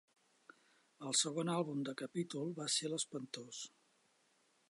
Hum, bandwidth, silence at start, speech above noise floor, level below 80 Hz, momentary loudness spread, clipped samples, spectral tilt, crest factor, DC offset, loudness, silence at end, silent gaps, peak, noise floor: none; 11.5 kHz; 1 s; 35 dB; under -90 dBFS; 14 LU; under 0.1%; -3 dB/octave; 22 dB; under 0.1%; -39 LUFS; 1 s; none; -20 dBFS; -76 dBFS